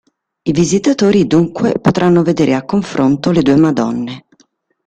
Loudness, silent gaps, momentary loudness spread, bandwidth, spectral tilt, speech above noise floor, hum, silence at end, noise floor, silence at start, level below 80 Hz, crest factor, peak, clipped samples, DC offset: -13 LUFS; none; 8 LU; 9.2 kHz; -6.5 dB/octave; 44 dB; none; 0.65 s; -56 dBFS; 0.45 s; -46 dBFS; 12 dB; 0 dBFS; under 0.1%; under 0.1%